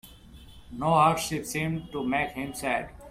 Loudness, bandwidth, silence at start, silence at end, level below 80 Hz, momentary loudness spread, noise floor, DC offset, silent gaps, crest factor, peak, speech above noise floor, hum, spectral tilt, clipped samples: -27 LUFS; 16 kHz; 0.05 s; 0 s; -52 dBFS; 10 LU; -49 dBFS; under 0.1%; none; 20 dB; -10 dBFS; 22 dB; none; -5 dB/octave; under 0.1%